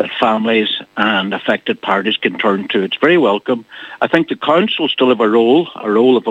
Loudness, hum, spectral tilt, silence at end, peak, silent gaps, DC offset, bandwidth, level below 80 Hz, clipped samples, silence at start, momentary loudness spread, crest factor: -14 LUFS; none; -6.5 dB/octave; 0 s; 0 dBFS; none; under 0.1%; 8 kHz; -62 dBFS; under 0.1%; 0 s; 6 LU; 14 dB